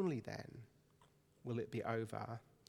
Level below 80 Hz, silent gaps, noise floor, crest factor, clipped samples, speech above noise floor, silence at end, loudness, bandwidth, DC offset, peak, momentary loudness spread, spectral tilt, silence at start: -78 dBFS; none; -72 dBFS; 20 dB; under 0.1%; 28 dB; 0.25 s; -45 LUFS; 15.5 kHz; under 0.1%; -26 dBFS; 15 LU; -7.5 dB/octave; 0 s